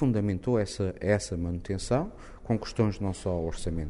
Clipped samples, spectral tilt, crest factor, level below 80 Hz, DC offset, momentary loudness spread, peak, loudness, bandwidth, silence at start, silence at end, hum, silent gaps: under 0.1%; -6.5 dB/octave; 18 dB; -42 dBFS; under 0.1%; 6 LU; -12 dBFS; -30 LUFS; 11.5 kHz; 0 s; 0 s; none; none